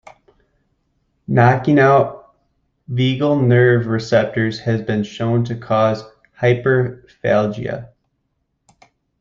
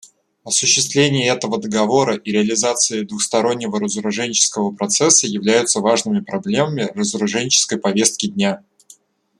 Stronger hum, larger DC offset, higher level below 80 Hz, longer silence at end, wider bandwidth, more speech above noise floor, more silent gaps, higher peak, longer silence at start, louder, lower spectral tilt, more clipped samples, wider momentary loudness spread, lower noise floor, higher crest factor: neither; neither; first, -52 dBFS vs -62 dBFS; first, 1.35 s vs 0.8 s; second, 7.4 kHz vs 13 kHz; first, 54 dB vs 32 dB; neither; about the same, -2 dBFS vs 0 dBFS; first, 1.3 s vs 0.45 s; about the same, -17 LUFS vs -17 LUFS; first, -8 dB/octave vs -3 dB/octave; neither; first, 12 LU vs 8 LU; first, -70 dBFS vs -50 dBFS; about the same, 16 dB vs 18 dB